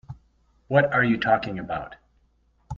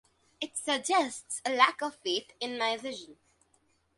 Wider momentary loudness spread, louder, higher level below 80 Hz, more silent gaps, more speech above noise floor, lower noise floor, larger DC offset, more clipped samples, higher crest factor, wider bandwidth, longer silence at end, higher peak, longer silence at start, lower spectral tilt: about the same, 13 LU vs 13 LU; first, -23 LUFS vs -30 LUFS; first, -52 dBFS vs -78 dBFS; neither; about the same, 42 dB vs 40 dB; second, -64 dBFS vs -71 dBFS; neither; neither; second, 20 dB vs 26 dB; second, 7.2 kHz vs 11.5 kHz; second, 0 s vs 0.85 s; about the same, -6 dBFS vs -6 dBFS; second, 0.1 s vs 0.4 s; first, -8 dB/octave vs -0.5 dB/octave